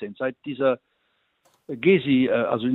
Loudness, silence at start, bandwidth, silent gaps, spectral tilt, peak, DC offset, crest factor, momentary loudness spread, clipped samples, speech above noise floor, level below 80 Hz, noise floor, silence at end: -23 LUFS; 0 s; 4.1 kHz; none; -9 dB/octave; -6 dBFS; under 0.1%; 16 dB; 11 LU; under 0.1%; 48 dB; -66 dBFS; -70 dBFS; 0 s